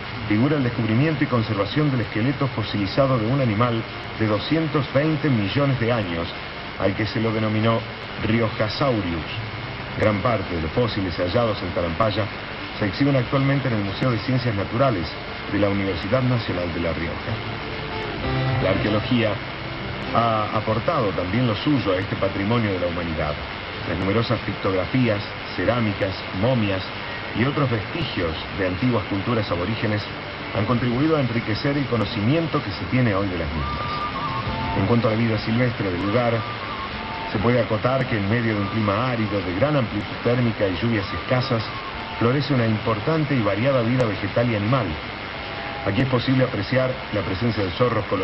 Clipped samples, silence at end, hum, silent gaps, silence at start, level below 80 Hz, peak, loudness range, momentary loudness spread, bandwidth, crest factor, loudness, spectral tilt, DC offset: under 0.1%; 0 s; none; none; 0 s; -42 dBFS; -4 dBFS; 2 LU; 8 LU; 6 kHz; 18 dB; -23 LUFS; -8.5 dB/octave; under 0.1%